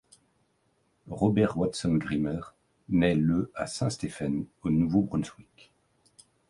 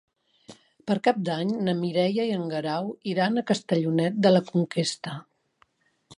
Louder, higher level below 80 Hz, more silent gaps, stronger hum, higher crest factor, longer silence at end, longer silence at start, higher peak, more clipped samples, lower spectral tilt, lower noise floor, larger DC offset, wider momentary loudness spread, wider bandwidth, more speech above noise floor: second, -28 LUFS vs -25 LUFS; first, -52 dBFS vs -72 dBFS; neither; neither; about the same, 18 dB vs 20 dB; first, 1.15 s vs 0.05 s; first, 1.05 s vs 0.5 s; second, -10 dBFS vs -6 dBFS; neither; about the same, -6.5 dB/octave vs -6 dB/octave; first, -71 dBFS vs -66 dBFS; neither; about the same, 9 LU vs 9 LU; about the same, 11.5 kHz vs 11.5 kHz; about the same, 44 dB vs 41 dB